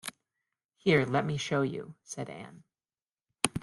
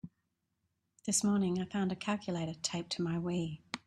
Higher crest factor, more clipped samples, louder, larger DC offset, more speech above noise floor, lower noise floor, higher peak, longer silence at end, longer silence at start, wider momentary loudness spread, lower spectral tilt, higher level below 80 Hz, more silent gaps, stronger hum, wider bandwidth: first, 32 dB vs 18 dB; neither; first, -30 LUFS vs -35 LUFS; neither; first, over 59 dB vs 48 dB; first, under -90 dBFS vs -83 dBFS; first, 0 dBFS vs -18 dBFS; about the same, 0 s vs 0.1 s; about the same, 0.05 s vs 0.05 s; first, 17 LU vs 8 LU; about the same, -4.5 dB/octave vs -4.5 dB/octave; first, -64 dBFS vs -70 dBFS; first, 0.65-0.69 s, 3.02-3.06 s vs none; neither; about the same, 12 kHz vs 12.5 kHz